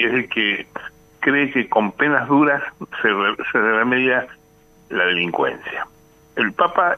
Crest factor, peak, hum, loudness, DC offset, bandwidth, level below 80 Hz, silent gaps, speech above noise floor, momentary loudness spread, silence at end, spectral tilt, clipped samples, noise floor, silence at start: 18 dB; -2 dBFS; none; -19 LUFS; under 0.1%; 12.5 kHz; -60 dBFS; none; 33 dB; 13 LU; 0 s; -6 dB/octave; under 0.1%; -52 dBFS; 0 s